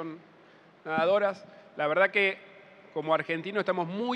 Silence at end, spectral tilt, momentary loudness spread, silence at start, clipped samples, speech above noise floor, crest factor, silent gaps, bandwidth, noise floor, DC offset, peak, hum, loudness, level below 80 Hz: 0 s; -6.5 dB/octave; 20 LU; 0 s; under 0.1%; 28 dB; 20 dB; none; 9 kHz; -57 dBFS; under 0.1%; -10 dBFS; none; -28 LUFS; -86 dBFS